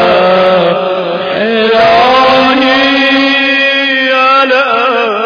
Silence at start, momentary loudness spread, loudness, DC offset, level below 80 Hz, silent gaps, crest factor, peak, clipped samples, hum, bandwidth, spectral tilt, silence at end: 0 s; 6 LU; -7 LUFS; under 0.1%; -46 dBFS; none; 8 dB; 0 dBFS; 0.3%; none; 5.4 kHz; -5 dB/octave; 0 s